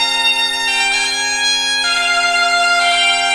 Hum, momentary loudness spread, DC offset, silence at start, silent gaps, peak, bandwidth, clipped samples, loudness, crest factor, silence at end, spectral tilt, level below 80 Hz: none; 2 LU; 0.2%; 0 s; none; -2 dBFS; 13.5 kHz; under 0.1%; -13 LUFS; 12 dB; 0 s; 1.5 dB/octave; -50 dBFS